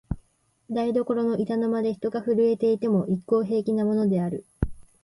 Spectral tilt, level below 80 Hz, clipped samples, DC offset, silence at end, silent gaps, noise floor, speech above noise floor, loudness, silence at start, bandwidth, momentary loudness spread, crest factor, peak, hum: -9 dB/octave; -44 dBFS; under 0.1%; under 0.1%; 0.2 s; none; -63 dBFS; 40 dB; -25 LUFS; 0.1 s; 11.5 kHz; 10 LU; 18 dB; -8 dBFS; none